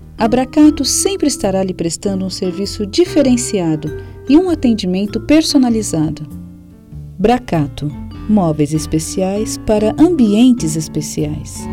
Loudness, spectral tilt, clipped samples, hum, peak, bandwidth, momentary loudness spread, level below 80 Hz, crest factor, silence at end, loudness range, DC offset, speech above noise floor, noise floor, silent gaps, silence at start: -15 LUFS; -5 dB/octave; under 0.1%; none; 0 dBFS; 16 kHz; 11 LU; -36 dBFS; 14 dB; 0 s; 3 LU; under 0.1%; 22 dB; -36 dBFS; none; 0 s